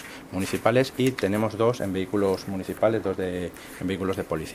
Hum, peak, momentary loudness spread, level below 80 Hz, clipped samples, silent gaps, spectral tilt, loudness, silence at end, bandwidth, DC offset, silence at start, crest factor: none; -4 dBFS; 10 LU; -54 dBFS; under 0.1%; none; -6 dB/octave; -26 LUFS; 0 s; 16 kHz; under 0.1%; 0 s; 22 dB